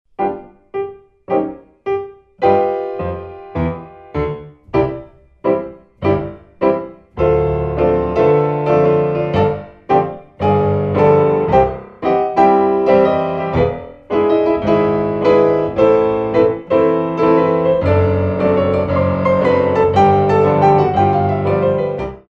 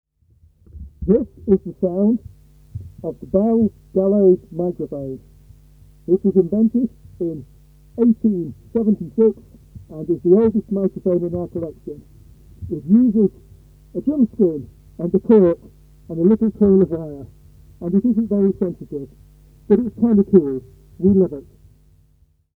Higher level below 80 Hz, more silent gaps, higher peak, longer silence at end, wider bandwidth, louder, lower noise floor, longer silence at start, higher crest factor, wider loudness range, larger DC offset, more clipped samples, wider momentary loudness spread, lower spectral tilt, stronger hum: first, -38 dBFS vs -46 dBFS; neither; about the same, 0 dBFS vs 0 dBFS; second, 0.1 s vs 1.15 s; first, 7 kHz vs 2.4 kHz; first, -15 LUFS vs -18 LUFS; second, -35 dBFS vs -58 dBFS; second, 0.2 s vs 0.75 s; second, 14 dB vs 20 dB; first, 7 LU vs 3 LU; neither; neither; second, 12 LU vs 17 LU; second, -9 dB/octave vs -12 dB/octave; neither